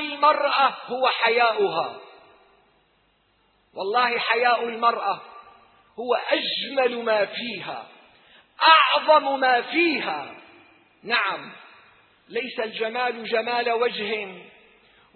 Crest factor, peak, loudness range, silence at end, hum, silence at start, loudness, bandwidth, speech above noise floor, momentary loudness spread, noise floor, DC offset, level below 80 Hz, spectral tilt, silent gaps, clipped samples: 22 dB; -2 dBFS; 7 LU; 0.65 s; none; 0 s; -22 LUFS; 4.5 kHz; 42 dB; 15 LU; -65 dBFS; under 0.1%; -76 dBFS; -5.5 dB/octave; none; under 0.1%